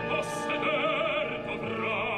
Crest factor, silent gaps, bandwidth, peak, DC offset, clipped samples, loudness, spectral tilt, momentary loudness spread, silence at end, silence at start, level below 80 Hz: 14 dB; none; 13 kHz; -16 dBFS; under 0.1%; under 0.1%; -29 LUFS; -4.5 dB/octave; 6 LU; 0 s; 0 s; -58 dBFS